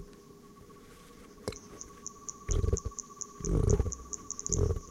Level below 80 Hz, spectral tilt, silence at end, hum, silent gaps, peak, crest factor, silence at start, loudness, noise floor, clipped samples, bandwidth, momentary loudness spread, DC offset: -38 dBFS; -5.5 dB/octave; 0 s; none; none; -12 dBFS; 22 dB; 0 s; -35 LUFS; -53 dBFS; under 0.1%; 15 kHz; 23 LU; under 0.1%